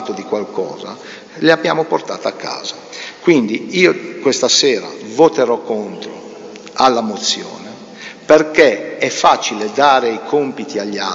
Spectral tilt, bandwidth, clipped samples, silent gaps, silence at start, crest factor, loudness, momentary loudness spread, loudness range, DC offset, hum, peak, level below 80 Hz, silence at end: -3 dB/octave; 8 kHz; under 0.1%; none; 0 s; 16 dB; -15 LUFS; 18 LU; 3 LU; under 0.1%; none; 0 dBFS; -60 dBFS; 0 s